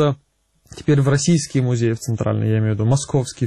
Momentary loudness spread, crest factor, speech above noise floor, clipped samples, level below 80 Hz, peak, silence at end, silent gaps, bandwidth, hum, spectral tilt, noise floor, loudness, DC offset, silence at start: 6 LU; 12 dB; 43 dB; under 0.1%; -48 dBFS; -6 dBFS; 0 s; none; 12.5 kHz; none; -6 dB/octave; -60 dBFS; -19 LUFS; under 0.1%; 0 s